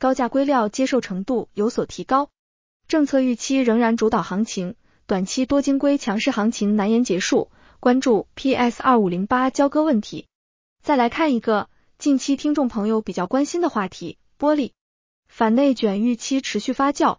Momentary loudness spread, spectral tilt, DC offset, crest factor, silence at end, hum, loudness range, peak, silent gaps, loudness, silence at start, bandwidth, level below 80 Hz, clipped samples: 8 LU; -5 dB/octave; under 0.1%; 16 dB; 0.05 s; none; 3 LU; -4 dBFS; 2.39-2.80 s, 10.35-10.76 s, 14.81-15.23 s; -21 LUFS; 0 s; 7.6 kHz; -54 dBFS; under 0.1%